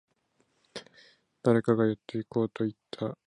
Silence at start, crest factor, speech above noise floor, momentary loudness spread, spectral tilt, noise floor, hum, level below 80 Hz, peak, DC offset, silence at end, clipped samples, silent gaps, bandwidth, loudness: 0.75 s; 20 dB; 44 dB; 21 LU; -8 dB/octave; -73 dBFS; none; -70 dBFS; -10 dBFS; under 0.1%; 0.1 s; under 0.1%; none; 10.5 kHz; -29 LUFS